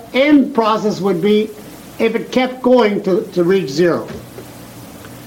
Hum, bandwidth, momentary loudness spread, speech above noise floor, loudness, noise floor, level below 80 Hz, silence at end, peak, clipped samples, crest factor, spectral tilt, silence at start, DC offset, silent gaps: none; 17 kHz; 22 LU; 20 dB; -15 LUFS; -35 dBFS; -52 dBFS; 0 s; -2 dBFS; under 0.1%; 14 dB; -6 dB/octave; 0 s; under 0.1%; none